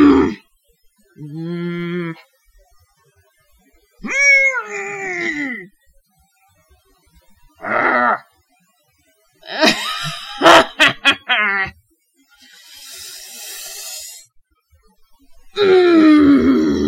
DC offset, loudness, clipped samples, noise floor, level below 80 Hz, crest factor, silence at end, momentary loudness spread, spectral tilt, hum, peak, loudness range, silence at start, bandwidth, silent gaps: under 0.1%; -14 LUFS; under 0.1%; -60 dBFS; -48 dBFS; 18 dB; 0 s; 22 LU; -4 dB/octave; none; 0 dBFS; 15 LU; 0 s; 16.5 kHz; none